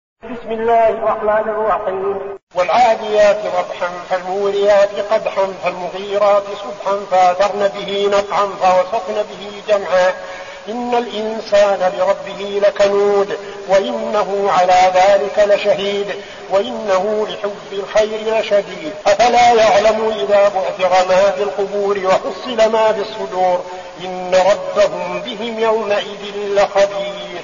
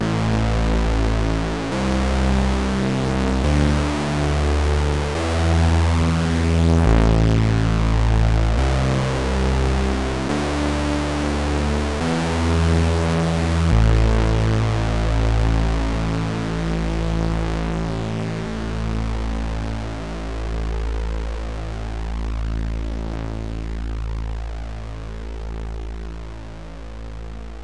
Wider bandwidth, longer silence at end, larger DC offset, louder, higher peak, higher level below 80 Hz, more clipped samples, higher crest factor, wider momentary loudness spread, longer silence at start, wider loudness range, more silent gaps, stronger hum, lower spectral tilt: second, 7.4 kHz vs 11 kHz; about the same, 0 s vs 0 s; second, under 0.1% vs 1%; first, -15 LUFS vs -21 LUFS; first, -2 dBFS vs -6 dBFS; second, -50 dBFS vs -24 dBFS; neither; about the same, 14 dB vs 14 dB; second, 11 LU vs 14 LU; first, 0.25 s vs 0 s; second, 4 LU vs 10 LU; first, 2.43-2.47 s vs none; neither; second, -1.5 dB/octave vs -6.5 dB/octave